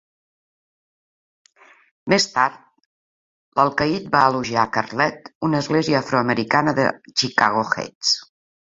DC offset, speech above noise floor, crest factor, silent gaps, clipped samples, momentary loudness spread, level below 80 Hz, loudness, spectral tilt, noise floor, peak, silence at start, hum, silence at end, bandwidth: under 0.1%; over 70 dB; 22 dB; 2.86-3.52 s, 5.35-5.41 s, 7.95-8.01 s; under 0.1%; 5 LU; -56 dBFS; -20 LUFS; -4 dB/octave; under -90 dBFS; 0 dBFS; 2.05 s; none; 0.5 s; 7.8 kHz